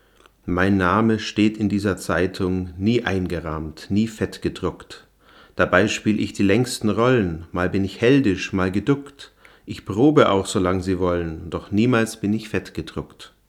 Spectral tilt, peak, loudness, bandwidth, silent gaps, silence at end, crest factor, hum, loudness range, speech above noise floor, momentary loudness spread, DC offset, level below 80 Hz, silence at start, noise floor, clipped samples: -6 dB/octave; 0 dBFS; -21 LUFS; 14.5 kHz; none; 0.2 s; 22 dB; none; 4 LU; 31 dB; 14 LU; under 0.1%; -50 dBFS; 0.45 s; -51 dBFS; under 0.1%